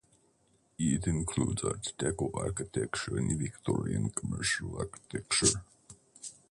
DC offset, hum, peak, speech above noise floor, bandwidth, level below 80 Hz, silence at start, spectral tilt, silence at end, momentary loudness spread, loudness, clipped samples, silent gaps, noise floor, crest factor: under 0.1%; none; -12 dBFS; 37 dB; 11.5 kHz; -50 dBFS; 0.8 s; -4 dB/octave; 0.2 s; 11 LU; -32 LUFS; under 0.1%; none; -70 dBFS; 22 dB